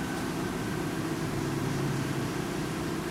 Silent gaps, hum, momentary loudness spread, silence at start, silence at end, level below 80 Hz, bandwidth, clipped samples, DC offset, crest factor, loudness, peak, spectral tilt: none; none; 2 LU; 0 s; 0 s; -50 dBFS; 16 kHz; under 0.1%; under 0.1%; 12 dB; -32 LUFS; -20 dBFS; -5.5 dB/octave